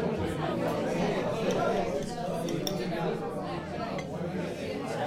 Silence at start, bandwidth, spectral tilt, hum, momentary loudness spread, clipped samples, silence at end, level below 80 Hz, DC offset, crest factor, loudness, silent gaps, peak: 0 s; 16.5 kHz; -6 dB/octave; none; 6 LU; under 0.1%; 0 s; -54 dBFS; under 0.1%; 18 dB; -32 LUFS; none; -14 dBFS